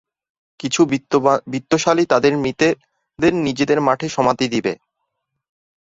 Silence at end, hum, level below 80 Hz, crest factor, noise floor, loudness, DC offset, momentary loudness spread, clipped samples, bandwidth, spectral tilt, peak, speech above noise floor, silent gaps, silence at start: 1.1 s; none; -54 dBFS; 18 dB; -75 dBFS; -18 LUFS; under 0.1%; 7 LU; under 0.1%; 8 kHz; -5 dB/octave; -2 dBFS; 58 dB; none; 0.65 s